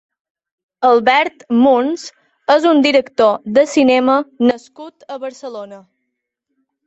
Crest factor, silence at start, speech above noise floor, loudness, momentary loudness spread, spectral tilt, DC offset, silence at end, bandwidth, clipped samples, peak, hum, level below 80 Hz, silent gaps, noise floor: 16 dB; 0.8 s; 61 dB; -14 LUFS; 18 LU; -4 dB/octave; under 0.1%; 1.1 s; 8.2 kHz; under 0.1%; 0 dBFS; none; -62 dBFS; none; -75 dBFS